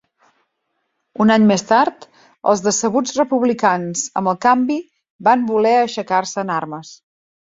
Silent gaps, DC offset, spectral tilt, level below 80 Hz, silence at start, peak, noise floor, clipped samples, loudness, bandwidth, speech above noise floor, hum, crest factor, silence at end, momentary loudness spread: 5.10-5.19 s; under 0.1%; -4.5 dB/octave; -62 dBFS; 1.2 s; -2 dBFS; -72 dBFS; under 0.1%; -17 LUFS; 7.8 kHz; 55 dB; none; 16 dB; 0.65 s; 9 LU